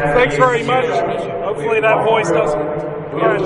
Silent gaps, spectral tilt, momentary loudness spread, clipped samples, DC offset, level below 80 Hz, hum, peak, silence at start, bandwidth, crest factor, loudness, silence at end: none; -5.5 dB/octave; 8 LU; under 0.1%; under 0.1%; -42 dBFS; none; 0 dBFS; 0 s; 11.5 kHz; 14 dB; -16 LUFS; 0 s